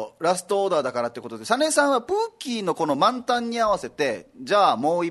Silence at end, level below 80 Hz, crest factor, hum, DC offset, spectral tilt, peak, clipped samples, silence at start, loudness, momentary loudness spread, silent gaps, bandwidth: 0 s; -62 dBFS; 18 dB; none; under 0.1%; -3.5 dB/octave; -4 dBFS; under 0.1%; 0 s; -23 LUFS; 8 LU; none; 12.5 kHz